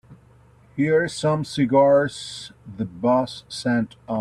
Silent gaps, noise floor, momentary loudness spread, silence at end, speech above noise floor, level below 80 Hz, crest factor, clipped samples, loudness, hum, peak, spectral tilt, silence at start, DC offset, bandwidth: none; -52 dBFS; 16 LU; 0 s; 31 dB; -58 dBFS; 16 dB; under 0.1%; -21 LUFS; none; -6 dBFS; -6 dB/octave; 0.1 s; under 0.1%; 12 kHz